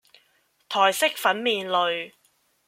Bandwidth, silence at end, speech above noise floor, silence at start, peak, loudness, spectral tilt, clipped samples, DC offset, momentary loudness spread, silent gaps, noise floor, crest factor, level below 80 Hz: 16.5 kHz; 0.6 s; 43 dB; 0.7 s; -4 dBFS; -23 LUFS; -1.5 dB/octave; under 0.1%; under 0.1%; 10 LU; none; -66 dBFS; 22 dB; -78 dBFS